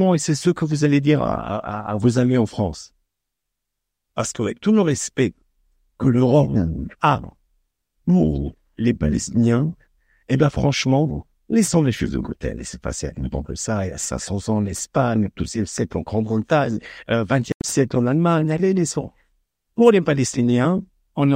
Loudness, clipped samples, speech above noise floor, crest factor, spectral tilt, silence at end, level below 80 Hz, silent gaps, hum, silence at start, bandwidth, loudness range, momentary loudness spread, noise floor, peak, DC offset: -20 LUFS; under 0.1%; 62 dB; 18 dB; -6 dB/octave; 0 s; -40 dBFS; 17.54-17.60 s; none; 0 s; 16 kHz; 4 LU; 10 LU; -81 dBFS; -2 dBFS; under 0.1%